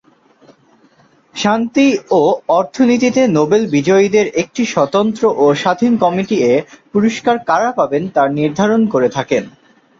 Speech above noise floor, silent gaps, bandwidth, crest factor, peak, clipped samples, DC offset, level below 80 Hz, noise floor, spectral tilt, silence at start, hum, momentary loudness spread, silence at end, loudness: 37 dB; none; 7.6 kHz; 12 dB; -2 dBFS; under 0.1%; under 0.1%; -56 dBFS; -51 dBFS; -5.5 dB/octave; 1.35 s; none; 5 LU; 0.5 s; -14 LUFS